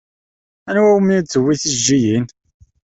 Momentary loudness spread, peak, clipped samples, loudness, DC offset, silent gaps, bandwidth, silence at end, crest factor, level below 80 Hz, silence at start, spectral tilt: 8 LU; -2 dBFS; under 0.1%; -15 LUFS; under 0.1%; none; 8.4 kHz; 0.7 s; 14 dB; -52 dBFS; 0.65 s; -4.5 dB/octave